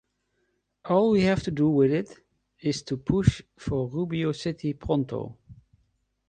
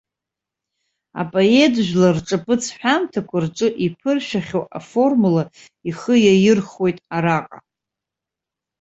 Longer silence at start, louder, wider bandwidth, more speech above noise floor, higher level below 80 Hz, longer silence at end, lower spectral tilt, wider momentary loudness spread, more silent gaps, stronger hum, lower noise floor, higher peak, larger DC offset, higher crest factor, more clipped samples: second, 0.85 s vs 1.15 s; second, -26 LUFS vs -18 LUFS; first, 9.4 kHz vs 8.2 kHz; second, 49 dB vs 68 dB; first, -46 dBFS vs -58 dBFS; second, 0.75 s vs 1.25 s; first, -7 dB/octave vs -5.5 dB/octave; about the same, 12 LU vs 12 LU; neither; neither; second, -74 dBFS vs -86 dBFS; second, -6 dBFS vs -2 dBFS; neither; first, 22 dB vs 16 dB; neither